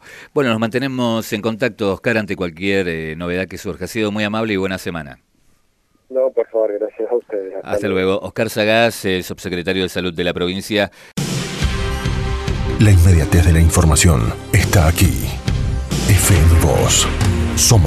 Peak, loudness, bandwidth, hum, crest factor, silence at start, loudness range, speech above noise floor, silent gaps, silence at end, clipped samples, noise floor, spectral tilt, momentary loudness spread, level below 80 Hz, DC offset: 0 dBFS; -17 LUFS; 14 kHz; none; 16 dB; 0.05 s; 8 LU; 44 dB; none; 0 s; under 0.1%; -60 dBFS; -5 dB/octave; 11 LU; -26 dBFS; under 0.1%